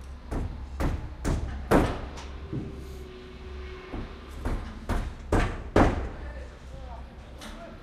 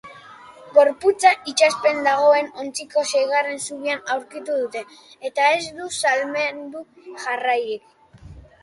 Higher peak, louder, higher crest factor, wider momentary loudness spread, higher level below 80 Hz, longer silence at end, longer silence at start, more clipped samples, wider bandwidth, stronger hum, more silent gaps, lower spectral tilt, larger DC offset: second, -8 dBFS vs -2 dBFS; second, -31 LUFS vs -20 LUFS; about the same, 24 dB vs 20 dB; first, 19 LU vs 16 LU; first, -34 dBFS vs -58 dBFS; second, 0 s vs 0.25 s; about the same, 0 s vs 0.05 s; neither; first, 15 kHz vs 11.5 kHz; neither; neither; first, -6.5 dB/octave vs -1.5 dB/octave; neither